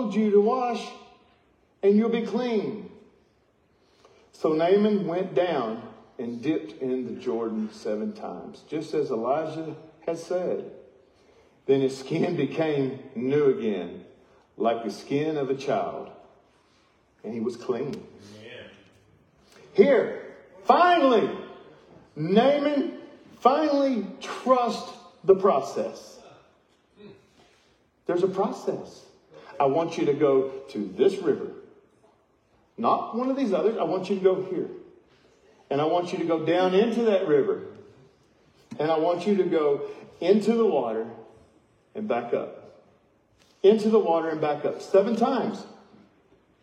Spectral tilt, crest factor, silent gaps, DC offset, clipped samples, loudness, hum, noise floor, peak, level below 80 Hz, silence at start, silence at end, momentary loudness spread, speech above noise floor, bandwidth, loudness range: -6.5 dB/octave; 22 dB; none; under 0.1%; under 0.1%; -25 LUFS; none; -65 dBFS; -4 dBFS; -74 dBFS; 0 s; 0.9 s; 18 LU; 41 dB; 9.4 kHz; 7 LU